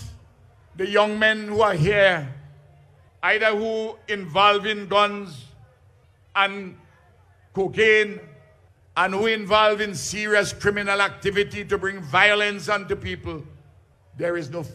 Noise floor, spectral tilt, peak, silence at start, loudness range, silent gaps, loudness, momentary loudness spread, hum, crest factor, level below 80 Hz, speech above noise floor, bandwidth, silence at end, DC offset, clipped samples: -56 dBFS; -4 dB/octave; -4 dBFS; 0 s; 3 LU; none; -21 LUFS; 14 LU; none; 20 dB; -52 dBFS; 34 dB; 14 kHz; 0 s; under 0.1%; under 0.1%